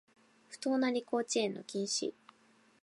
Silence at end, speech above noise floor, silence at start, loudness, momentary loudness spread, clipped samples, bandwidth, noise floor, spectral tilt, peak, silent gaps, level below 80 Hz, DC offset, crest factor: 0.75 s; 33 dB; 0.5 s; -35 LUFS; 8 LU; under 0.1%; 11.5 kHz; -67 dBFS; -3 dB/octave; -20 dBFS; none; -90 dBFS; under 0.1%; 16 dB